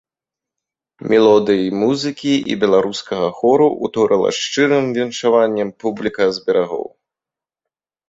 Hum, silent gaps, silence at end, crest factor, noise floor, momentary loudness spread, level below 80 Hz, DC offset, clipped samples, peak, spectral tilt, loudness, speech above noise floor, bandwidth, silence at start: none; none; 1.25 s; 16 dB; -88 dBFS; 8 LU; -58 dBFS; under 0.1%; under 0.1%; -2 dBFS; -5 dB/octave; -16 LUFS; 73 dB; 8 kHz; 1 s